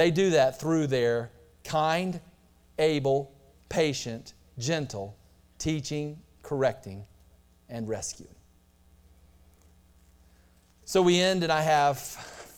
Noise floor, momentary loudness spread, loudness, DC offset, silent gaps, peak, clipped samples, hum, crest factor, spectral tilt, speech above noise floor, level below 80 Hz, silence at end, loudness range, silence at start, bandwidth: -61 dBFS; 20 LU; -27 LUFS; under 0.1%; none; -10 dBFS; under 0.1%; none; 18 dB; -5 dB/octave; 34 dB; -58 dBFS; 0.1 s; 14 LU; 0 s; 18.5 kHz